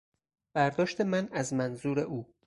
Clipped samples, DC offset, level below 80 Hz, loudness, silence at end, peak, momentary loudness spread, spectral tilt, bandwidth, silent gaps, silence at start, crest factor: under 0.1%; under 0.1%; -66 dBFS; -31 LUFS; 0.25 s; -14 dBFS; 5 LU; -6 dB/octave; 11.5 kHz; none; 0.55 s; 18 dB